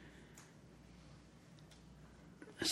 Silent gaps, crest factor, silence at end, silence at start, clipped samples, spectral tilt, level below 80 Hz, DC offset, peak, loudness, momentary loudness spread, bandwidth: none; 24 dB; 0 s; 0 s; under 0.1%; -2 dB/octave; -68 dBFS; under 0.1%; -26 dBFS; -53 LUFS; 3 LU; 16 kHz